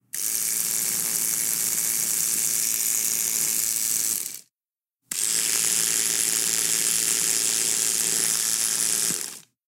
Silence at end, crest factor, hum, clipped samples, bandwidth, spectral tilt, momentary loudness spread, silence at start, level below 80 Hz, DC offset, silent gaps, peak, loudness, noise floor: 0.25 s; 20 dB; none; under 0.1%; 17 kHz; 1 dB/octave; 4 LU; 0.15 s; -68 dBFS; under 0.1%; none; -4 dBFS; -21 LUFS; under -90 dBFS